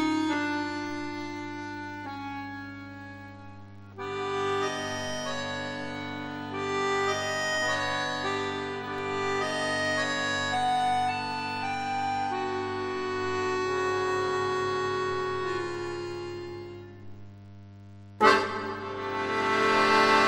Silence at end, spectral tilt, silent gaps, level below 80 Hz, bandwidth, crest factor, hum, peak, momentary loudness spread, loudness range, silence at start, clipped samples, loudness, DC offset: 0 s; -4 dB/octave; none; -62 dBFS; 12.5 kHz; 24 dB; 50 Hz at -50 dBFS; -6 dBFS; 17 LU; 7 LU; 0 s; under 0.1%; -29 LUFS; under 0.1%